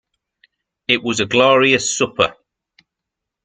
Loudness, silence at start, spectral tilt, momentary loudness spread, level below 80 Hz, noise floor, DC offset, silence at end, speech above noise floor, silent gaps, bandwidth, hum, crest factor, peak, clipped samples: -15 LUFS; 0.9 s; -3 dB/octave; 7 LU; -56 dBFS; -82 dBFS; under 0.1%; 1.15 s; 67 dB; none; 9.6 kHz; none; 18 dB; -2 dBFS; under 0.1%